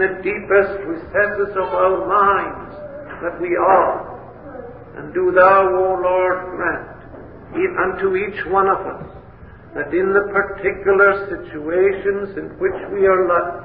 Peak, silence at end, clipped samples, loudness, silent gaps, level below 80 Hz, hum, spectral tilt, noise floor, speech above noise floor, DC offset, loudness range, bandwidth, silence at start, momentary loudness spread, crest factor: 0 dBFS; 0 s; under 0.1%; -18 LUFS; none; -46 dBFS; none; -10.5 dB/octave; -40 dBFS; 23 dB; 0.3%; 4 LU; 4.8 kHz; 0 s; 20 LU; 18 dB